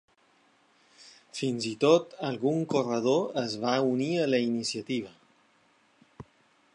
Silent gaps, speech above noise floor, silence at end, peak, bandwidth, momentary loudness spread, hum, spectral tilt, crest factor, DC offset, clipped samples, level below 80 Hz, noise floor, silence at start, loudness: none; 38 dB; 0.55 s; -10 dBFS; 11 kHz; 11 LU; none; -5 dB/octave; 20 dB; under 0.1%; under 0.1%; -74 dBFS; -65 dBFS; 1 s; -28 LUFS